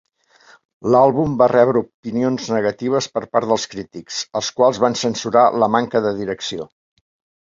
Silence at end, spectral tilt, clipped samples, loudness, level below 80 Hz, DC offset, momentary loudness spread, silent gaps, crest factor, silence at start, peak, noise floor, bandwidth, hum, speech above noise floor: 0.8 s; -5 dB/octave; under 0.1%; -18 LUFS; -56 dBFS; under 0.1%; 13 LU; 1.94-2.03 s; 18 dB; 0.85 s; -2 dBFS; -51 dBFS; 7.8 kHz; none; 34 dB